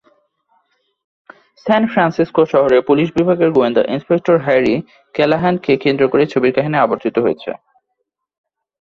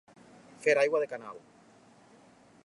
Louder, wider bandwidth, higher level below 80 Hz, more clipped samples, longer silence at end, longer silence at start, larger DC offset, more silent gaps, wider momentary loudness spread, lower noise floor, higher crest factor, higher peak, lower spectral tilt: first, -15 LUFS vs -29 LUFS; second, 7 kHz vs 11.5 kHz; first, -54 dBFS vs -82 dBFS; neither; about the same, 1.25 s vs 1.3 s; first, 1.65 s vs 0.6 s; neither; neither; second, 6 LU vs 22 LU; first, -73 dBFS vs -59 dBFS; second, 14 dB vs 20 dB; first, -2 dBFS vs -14 dBFS; first, -8 dB/octave vs -3.5 dB/octave